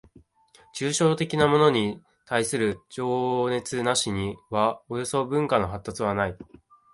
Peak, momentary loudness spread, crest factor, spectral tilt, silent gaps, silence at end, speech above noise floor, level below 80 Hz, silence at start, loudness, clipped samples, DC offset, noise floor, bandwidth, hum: -6 dBFS; 10 LU; 20 dB; -4.5 dB/octave; none; 0.5 s; 34 dB; -52 dBFS; 0.75 s; -25 LUFS; under 0.1%; under 0.1%; -58 dBFS; 11.5 kHz; none